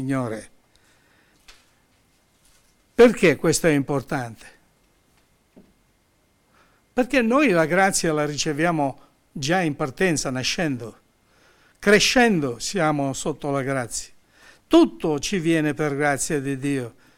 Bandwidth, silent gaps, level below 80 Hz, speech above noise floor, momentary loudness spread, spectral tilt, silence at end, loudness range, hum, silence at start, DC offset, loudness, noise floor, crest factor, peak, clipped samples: 16.5 kHz; none; -50 dBFS; 42 dB; 13 LU; -4.5 dB/octave; 0.25 s; 4 LU; none; 0 s; under 0.1%; -21 LUFS; -63 dBFS; 18 dB; -6 dBFS; under 0.1%